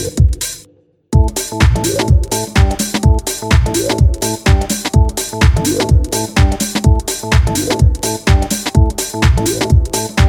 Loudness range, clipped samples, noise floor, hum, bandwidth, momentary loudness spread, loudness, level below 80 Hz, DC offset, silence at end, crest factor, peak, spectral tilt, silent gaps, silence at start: 1 LU; under 0.1%; -49 dBFS; none; 18.5 kHz; 3 LU; -14 LUFS; -16 dBFS; under 0.1%; 0 s; 12 dB; 0 dBFS; -5 dB/octave; none; 0 s